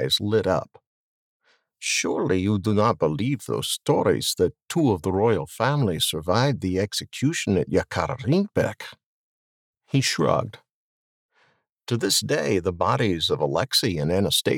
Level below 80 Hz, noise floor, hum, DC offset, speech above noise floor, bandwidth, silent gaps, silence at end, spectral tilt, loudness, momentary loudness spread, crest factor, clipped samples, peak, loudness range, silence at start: -54 dBFS; -65 dBFS; none; under 0.1%; 43 dB; 19 kHz; 0.87-1.40 s, 9.06-9.74 s, 10.70-11.29 s, 11.69-11.78 s; 0 s; -4.5 dB/octave; -23 LUFS; 6 LU; 18 dB; under 0.1%; -6 dBFS; 4 LU; 0 s